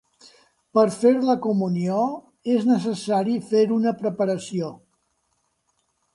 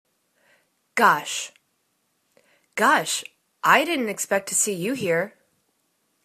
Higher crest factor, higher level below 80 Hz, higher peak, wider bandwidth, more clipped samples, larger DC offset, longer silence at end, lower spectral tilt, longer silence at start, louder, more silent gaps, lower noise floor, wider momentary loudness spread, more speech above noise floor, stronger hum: second, 18 dB vs 24 dB; about the same, -70 dBFS vs -74 dBFS; second, -6 dBFS vs -2 dBFS; second, 11.5 kHz vs 14 kHz; neither; neither; first, 1.4 s vs 0.95 s; first, -7 dB/octave vs -2 dB/octave; second, 0.75 s vs 0.95 s; about the same, -22 LUFS vs -22 LUFS; neither; about the same, -71 dBFS vs -71 dBFS; second, 9 LU vs 13 LU; about the same, 50 dB vs 49 dB; neither